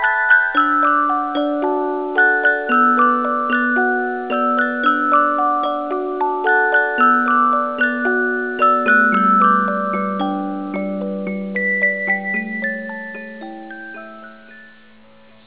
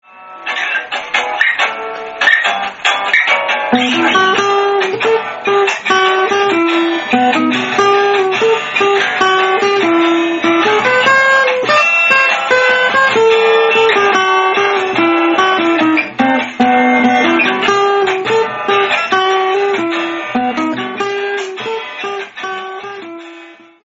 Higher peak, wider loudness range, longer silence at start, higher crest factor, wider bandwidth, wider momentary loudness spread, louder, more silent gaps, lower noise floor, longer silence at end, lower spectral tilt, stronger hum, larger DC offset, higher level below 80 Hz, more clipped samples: about the same, -2 dBFS vs 0 dBFS; about the same, 6 LU vs 5 LU; second, 0 s vs 0.15 s; about the same, 16 dB vs 12 dB; second, 4 kHz vs 8 kHz; about the same, 11 LU vs 10 LU; second, -16 LUFS vs -12 LUFS; neither; first, -48 dBFS vs -37 dBFS; first, 0.8 s vs 0.3 s; first, -8.5 dB/octave vs -0.5 dB/octave; neither; first, 0.4% vs under 0.1%; second, -64 dBFS vs -58 dBFS; neither